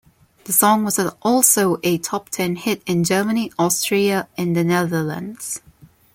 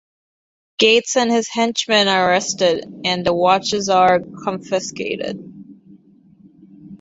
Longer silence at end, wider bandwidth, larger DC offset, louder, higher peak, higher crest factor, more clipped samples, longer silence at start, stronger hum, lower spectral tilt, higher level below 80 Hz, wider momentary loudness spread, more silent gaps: first, 0.55 s vs 0.05 s; first, 17 kHz vs 8 kHz; neither; about the same, -19 LUFS vs -17 LUFS; about the same, 0 dBFS vs 0 dBFS; about the same, 20 dB vs 18 dB; neither; second, 0.45 s vs 0.8 s; neither; about the same, -4 dB/octave vs -3 dB/octave; about the same, -60 dBFS vs -58 dBFS; about the same, 12 LU vs 12 LU; neither